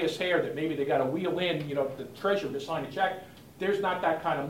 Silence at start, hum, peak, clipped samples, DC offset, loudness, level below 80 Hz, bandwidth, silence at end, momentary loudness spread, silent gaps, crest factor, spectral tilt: 0 s; none; -14 dBFS; under 0.1%; under 0.1%; -30 LUFS; -66 dBFS; 16 kHz; 0 s; 6 LU; none; 16 dB; -5.5 dB/octave